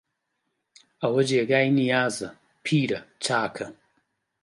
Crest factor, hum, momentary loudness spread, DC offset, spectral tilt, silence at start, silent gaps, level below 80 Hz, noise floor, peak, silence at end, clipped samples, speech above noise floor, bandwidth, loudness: 20 dB; none; 14 LU; under 0.1%; -5 dB/octave; 1 s; none; -68 dBFS; -78 dBFS; -6 dBFS; 0.7 s; under 0.1%; 54 dB; 11.5 kHz; -24 LUFS